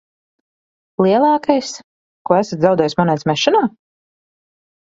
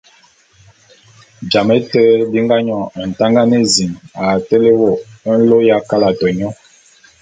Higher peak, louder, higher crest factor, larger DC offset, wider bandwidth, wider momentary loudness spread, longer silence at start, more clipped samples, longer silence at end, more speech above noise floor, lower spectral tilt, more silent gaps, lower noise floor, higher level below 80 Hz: about the same, 0 dBFS vs 0 dBFS; second, -16 LUFS vs -13 LUFS; about the same, 18 dB vs 14 dB; neither; second, 7.8 kHz vs 9.4 kHz; first, 15 LU vs 10 LU; second, 1 s vs 1.4 s; neither; first, 1.15 s vs 0.7 s; first, over 75 dB vs 37 dB; about the same, -5.5 dB/octave vs -5 dB/octave; first, 1.84-2.25 s vs none; first, under -90 dBFS vs -50 dBFS; second, -60 dBFS vs -50 dBFS